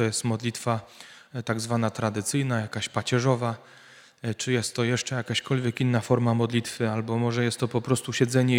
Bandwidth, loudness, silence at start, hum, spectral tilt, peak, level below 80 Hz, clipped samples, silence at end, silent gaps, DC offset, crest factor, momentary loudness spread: 16 kHz; -27 LUFS; 0 s; none; -5 dB/octave; -6 dBFS; -66 dBFS; under 0.1%; 0 s; none; under 0.1%; 20 dB; 8 LU